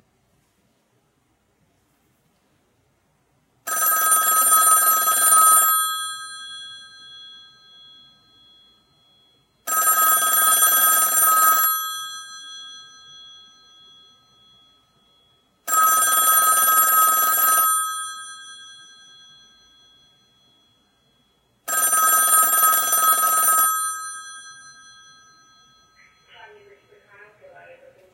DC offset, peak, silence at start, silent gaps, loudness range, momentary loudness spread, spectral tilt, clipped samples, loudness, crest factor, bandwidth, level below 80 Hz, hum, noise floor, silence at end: under 0.1%; -4 dBFS; 3.65 s; none; 12 LU; 22 LU; 3 dB/octave; under 0.1%; -15 LUFS; 18 dB; 17.5 kHz; -74 dBFS; none; -66 dBFS; 3.6 s